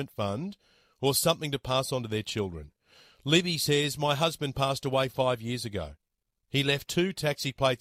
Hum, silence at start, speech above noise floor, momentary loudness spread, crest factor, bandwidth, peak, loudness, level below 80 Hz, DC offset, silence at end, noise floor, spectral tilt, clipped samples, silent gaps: none; 0 s; 49 dB; 11 LU; 22 dB; 16.5 kHz; -8 dBFS; -28 LUFS; -56 dBFS; under 0.1%; 0.05 s; -78 dBFS; -4 dB/octave; under 0.1%; none